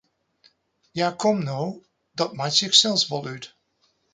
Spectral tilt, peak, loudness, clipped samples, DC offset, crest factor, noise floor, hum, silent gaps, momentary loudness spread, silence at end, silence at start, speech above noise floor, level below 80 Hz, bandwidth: -3 dB/octave; -2 dBFS; -21 LUFS; under 0.1%; under 0.1%; 24 dB; -68 dBFS; none; none; 22 LU; 0.65 s; 0.95 s; 45 dB; -70 dBFS; 9.6 kHz